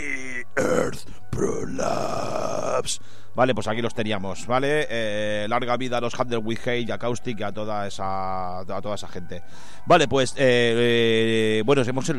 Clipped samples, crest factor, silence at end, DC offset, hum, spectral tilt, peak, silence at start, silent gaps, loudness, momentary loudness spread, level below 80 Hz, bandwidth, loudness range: under 0.1%; 18 dB; 0 s; 4%; none; -4.5 dB/octave; -6 dBFS; 0 s; none; -24 LUFS; 12 LU; -50 dBFS; 14 kHz; 7 LU